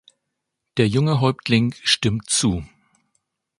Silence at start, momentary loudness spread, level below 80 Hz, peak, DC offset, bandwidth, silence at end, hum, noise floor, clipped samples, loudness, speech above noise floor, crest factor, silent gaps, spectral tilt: 0.75 s; 5 LU; -46 dBFS; -2 dBFS; under 0.1%; 11.5 kHz; 0.95 s; none; -79 dBFS; under 0.1%; -20 LUFS; 60 dB; 20 dB; none; -4.5 dB/octave